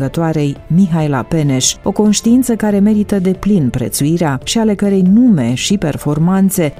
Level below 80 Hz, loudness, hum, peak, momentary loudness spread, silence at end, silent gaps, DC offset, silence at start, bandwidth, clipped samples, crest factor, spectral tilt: -38 dBFS; -13 LUFS; none; 0 dBFS; 5 LU; 0.05 s; none; under 0.1%; 0 s; 16 kHz; under 0.1%; 12 dB; -5.5 dB/octave